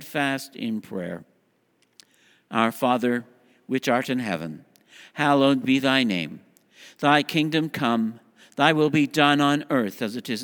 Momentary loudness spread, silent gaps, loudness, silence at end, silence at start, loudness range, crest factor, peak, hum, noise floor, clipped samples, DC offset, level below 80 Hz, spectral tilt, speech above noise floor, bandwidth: 13 LU; none; -23 LUFS; 0 s; 0 s; 6 LU; 22 dB; -2 dBFS; none; -66 dBFS; under 0.1%; under 0.1%; -72 dBFS; -5 dB/octave; 44 dB; over 20 kHz